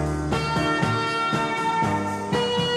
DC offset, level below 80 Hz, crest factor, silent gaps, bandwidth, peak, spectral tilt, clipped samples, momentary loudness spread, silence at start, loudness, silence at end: under 0.1%; -40 dBFS; 16 dB; none; 13.5 kHz; -8 dBFS; -5 dB/octave; under 0.1%; 3 LU; 0 s; -23 LUFS; 0 s